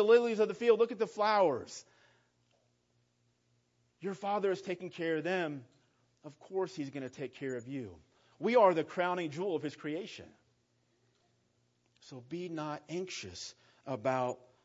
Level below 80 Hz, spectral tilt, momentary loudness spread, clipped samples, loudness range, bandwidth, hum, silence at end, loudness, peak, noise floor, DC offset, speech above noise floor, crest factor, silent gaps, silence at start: -82 dBFS; -4 dB/octave; 19 LU; under 0.1%; 11 LU; 7.6 kHz; 60 Hz at -70 dBFS; 0.3 s; -34 LUFS; -14 dBFS; -75 dBFS; under 0.1%; 42 dB; 20 dB; none; 0 s